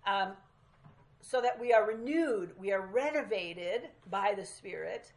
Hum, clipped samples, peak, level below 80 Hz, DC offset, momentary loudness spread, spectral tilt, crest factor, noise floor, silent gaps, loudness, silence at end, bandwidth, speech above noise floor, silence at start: none; under 0.1%; -14 dBFS; -72 dBFS; under 0.1%; 12 LU; -4 dB/octave; 20 dB; -62 dBFS; none; -33 LUFS; 0.1 s; 11.5 kHz; 29 dB; 0.05 s